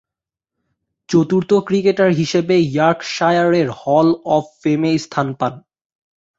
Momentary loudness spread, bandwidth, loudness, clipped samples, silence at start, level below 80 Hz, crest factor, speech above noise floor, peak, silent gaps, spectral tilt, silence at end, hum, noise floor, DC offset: 5 LU; 7.8 kHz; -16 LUFS; under 0.1%; 1.1 s; -58 dBFS; 16 dB; 71 dB; -2 dBFS; none; -6.5 dB/octave; 0.8 s; none; -87 dBFS; under 0.1%